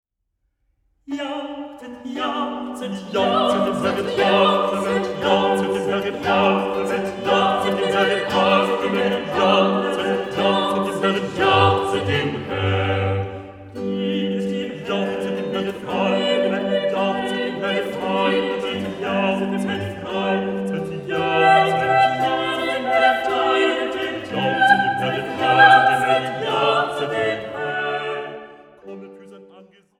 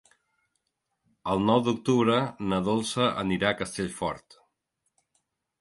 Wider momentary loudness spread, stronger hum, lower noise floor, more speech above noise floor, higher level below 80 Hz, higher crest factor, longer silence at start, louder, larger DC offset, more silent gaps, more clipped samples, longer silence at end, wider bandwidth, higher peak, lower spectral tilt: about the same, 11 LU vs 10 LU; neither; second, -73 dBFS vs -80 dBFS; about the same, 52 dB vs 54 dB; about the same, -56 dBFS vs -58 dBFS; about the same, 20 dB vs 20 dB; second, 1.1 s vs 1.25 s; first, -20 LUFS vs -26 LUFS; neither; neither; neither; second, 0.35 s vs 1.45 s; first, 15 kHz vs 11.5 kHz; first, 0 dBFS vs -8 dBFS; about the same, -5.5 dB/octave vs -5.5 dB/octave